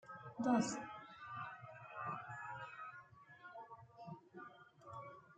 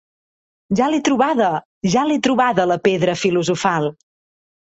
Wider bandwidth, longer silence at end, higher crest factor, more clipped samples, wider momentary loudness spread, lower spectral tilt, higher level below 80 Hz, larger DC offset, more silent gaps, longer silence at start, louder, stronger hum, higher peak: about the same, 9 kHz vs 8.2 kHz; second, 0 s vs 0.75 s; first, 22 dB vs 16 dB; neither; first, 21 LU vs 5 LU; about the same, -5 dB/octave vs -5 dB/octave; second, -84 dBFS vs -56 dBFS; neither; second, none vs 1.65-1.81 s; second, 0.05 s vs 0.7 s; second, -46 LUFS vs -18 LUFS; neither; second, -24 dBFS vs -2 dBFS